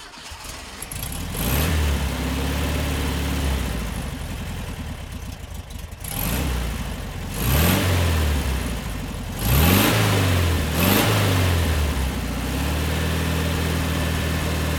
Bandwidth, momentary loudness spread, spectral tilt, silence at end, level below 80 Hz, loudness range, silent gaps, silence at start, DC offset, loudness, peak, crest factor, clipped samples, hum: 19 kHz; 15 LU; -4.5 dB/octave; 0 s; -28 dBFS; 9 LU; none; 0 s; under 0.1%; -22 LUFS; -2 dBFS; 20 dB; under 0.1%; none